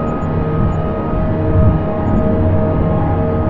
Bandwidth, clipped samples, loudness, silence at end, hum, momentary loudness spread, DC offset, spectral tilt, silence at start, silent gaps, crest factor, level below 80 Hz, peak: 4.2 kHz; under 0.1%; -16 LUFS; 0 s; none; 5 LU; under 0.1%; -11 dB/octave; 0 s; none; 14 dB; -24 dBFS; 0 dBFS